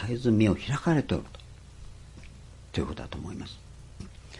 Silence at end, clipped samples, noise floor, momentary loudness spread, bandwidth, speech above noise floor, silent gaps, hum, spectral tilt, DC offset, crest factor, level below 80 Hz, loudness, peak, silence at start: 0 s; under 0.1%; -47 dBFS; 25 LU; 11.5 kHz; 20 dB; none; none; -7 dB/octave; under 0.1%; 20 dB; -48 dBFS; -29 LUFS; -10 dBFS; 0 s